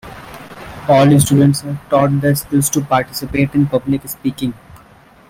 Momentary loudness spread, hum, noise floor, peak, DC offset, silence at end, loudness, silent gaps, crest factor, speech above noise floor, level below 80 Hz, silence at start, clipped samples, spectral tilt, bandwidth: 20 LU; none; -45 dBFS; 0 dBFS; under 0.1%; 0.55 s; -15 LUFS; none; 14 dB; 31 dB; -44 dBFS; 0.05 s; under 0.1%; -6 dB/octave; 16.5 kHz